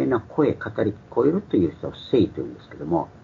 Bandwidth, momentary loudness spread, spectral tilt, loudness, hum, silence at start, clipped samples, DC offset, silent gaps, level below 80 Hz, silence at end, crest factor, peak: 7 kHz; 12 LU; -9 dB/octave; -24 LUFS; none; 0 s; under 0.1%; under 0.1%; none; -52 dBFS; 0.15 s; 16 dB; -8 dBFS